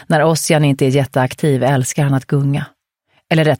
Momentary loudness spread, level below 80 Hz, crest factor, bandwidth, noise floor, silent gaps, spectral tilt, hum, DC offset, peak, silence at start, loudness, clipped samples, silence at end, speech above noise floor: 5 LU; -52 dBFS; 14 dB; 16.5 kHz; -62 dBFS; none; -5.5 dB/octave; none; under 0.1%; 0 dBFS; 0.1 s; -15 LUFS; under 0.1%; 0.05 s; 48 dB